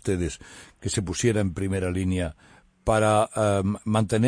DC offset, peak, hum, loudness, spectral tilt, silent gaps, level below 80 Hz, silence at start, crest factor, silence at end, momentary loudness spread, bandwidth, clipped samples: under 0.1%; -8 dBFS; none; -25 LUFS; -6 dB/octave; none; -44 dBFS; 0.05 s; 16 dB; 0 s; 11 LU; 10.5 kHz; under 0.1%